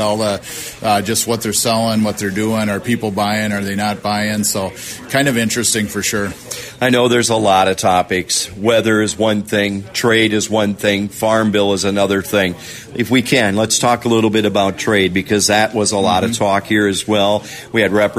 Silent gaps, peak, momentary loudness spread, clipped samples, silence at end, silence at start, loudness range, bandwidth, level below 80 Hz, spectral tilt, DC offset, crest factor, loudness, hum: none; 0 dBFS; 6 LU; under 0.1%; 0 s; 0 s; 3 LU; 16 kHz; -48 dBFS; -3.5 dB/octave; under 0.1%; 14 dB; -15 LUFS; none